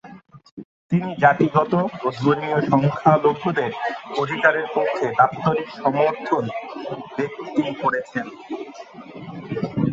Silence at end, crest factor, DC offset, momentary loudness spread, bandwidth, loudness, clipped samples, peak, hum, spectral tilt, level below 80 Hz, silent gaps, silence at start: 0 s; 22 dB; under 0.1%; 16 LU; 7.6 kHz; -21 LUFS; under 0.1%; 0 dBFS; none; -7.5 dB/octave; -60 dBFS; 0.51-0.57 s, 0.65-0.89 s; 0.05 s